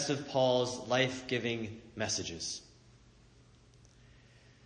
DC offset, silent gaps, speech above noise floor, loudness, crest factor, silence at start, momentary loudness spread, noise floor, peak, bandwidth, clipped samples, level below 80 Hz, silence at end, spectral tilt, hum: under 0.1%; none; 27 dB; -33 LUFS; 20 dB; 0 s; 10 LU; -61 dBFS; -16 dBFS; 10 kHz; under 0.1%; -66 dBFS; 2 s; -3.5 dB/octave; none